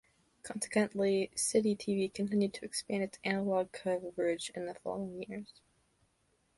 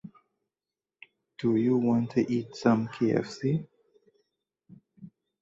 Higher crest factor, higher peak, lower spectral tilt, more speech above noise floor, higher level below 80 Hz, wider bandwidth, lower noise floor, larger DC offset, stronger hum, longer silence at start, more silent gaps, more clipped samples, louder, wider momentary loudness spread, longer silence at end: about the same, 18 dB vs 20 dB; second, -16 dBFS vs -10 dBFS; second, -4.5 dB/octave vs -8 dB/octave; second, 41 dB vs over 64 dB; about the same, -72 dBFS vs -68 dBFS; first, 11.5 kHz vs 7.6 kHz; second, -75 dBFS vs under -90 dBFS; neither; neither; first, 0.45 s vs 0.05 s; neither; neither; second, -34 LUFS vs -27 LUFS; first, 12 LU vs 7 LU; first, 1.05 s vs 0.35 s